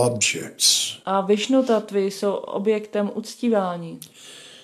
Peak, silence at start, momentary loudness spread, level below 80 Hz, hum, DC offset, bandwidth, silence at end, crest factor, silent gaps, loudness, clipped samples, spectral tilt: -4 dBFS; 0 s; 19 LU; -72 dBFS; none; under 0.1%; 15 kHz; 0.05 s; 18 dB; none; -21 LUFS; under 0.1%; -3 dB/octave